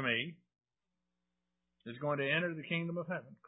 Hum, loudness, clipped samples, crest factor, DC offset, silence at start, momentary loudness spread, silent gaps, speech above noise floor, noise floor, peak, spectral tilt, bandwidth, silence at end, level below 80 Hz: 60 Hz at -65 dBFS; -36 LUFS; under 0.1%; 20 dB; under 0.1%; 0 s; 13 LU; none; 52 dB; -90 dBFS; -18 dBFS; -2.5 dB/octave; 3.9 kHz; 0.15 s; -82 dBFS